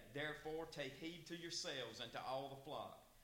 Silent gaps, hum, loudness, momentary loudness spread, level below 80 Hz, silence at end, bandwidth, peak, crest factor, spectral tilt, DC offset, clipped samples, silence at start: none; none; -49 LUFS; 6 LU; -72 dBFS; 0 s; 16.5 kHz; -32 dBFS; 16 dB; -3 dB/octave; under 0.1%; under 0.1%; 0 s